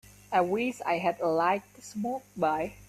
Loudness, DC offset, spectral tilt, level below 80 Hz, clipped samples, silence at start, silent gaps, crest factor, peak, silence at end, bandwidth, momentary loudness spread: -29 LUFS; under 0.1%; -5.5 dB/octave; -64 dBFS; under 0.1%; 0.3 s; none; 18 dB; -10 dBFS; 0.05 s; 14.5 kHz; 8 LU